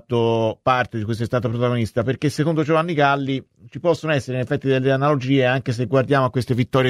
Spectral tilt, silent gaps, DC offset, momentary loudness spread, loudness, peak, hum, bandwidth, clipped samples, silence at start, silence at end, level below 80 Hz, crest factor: -7 dB/octave; none; under 0.1%; 6 LU; -20 LUFS; -4 dBFS; none; 12.5 kHz; under 0.1%; 0.1 s; 0 s; -54 dBFS; 16 dB